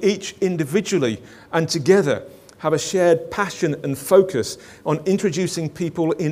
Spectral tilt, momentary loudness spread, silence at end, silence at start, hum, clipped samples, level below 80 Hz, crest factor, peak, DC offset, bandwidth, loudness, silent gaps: -5 dB/octave; 9 LU; 0 s; 0 s; none; under 0.1%; -58 dBFS; 18 dB; -2 dBFS; under 0.1%; 16 kHz; -21 LUFS; none